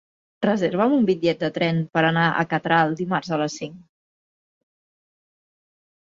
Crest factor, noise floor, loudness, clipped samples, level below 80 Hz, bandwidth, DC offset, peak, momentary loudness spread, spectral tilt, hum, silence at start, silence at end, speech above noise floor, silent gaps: 20 dB; under -90 dBFS; -21 LUFS; under 0.1%; -64 dBFS; 7.6 kHz; under 0.1%; -4 dBFS; 7 LU; -6 dB/octave; none; 0.4 s; 2.25 s; over 69 dB; none